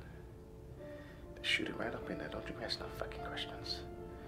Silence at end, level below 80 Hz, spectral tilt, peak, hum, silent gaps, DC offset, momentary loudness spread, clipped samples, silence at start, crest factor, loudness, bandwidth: 0 s; -56 dBFS; -4 dB/octave; -20 dBFS; none; none; under 0.1%; 18 LU; under 0.1%; 0 s; 22 dB; -41 LUFS; 16 kHz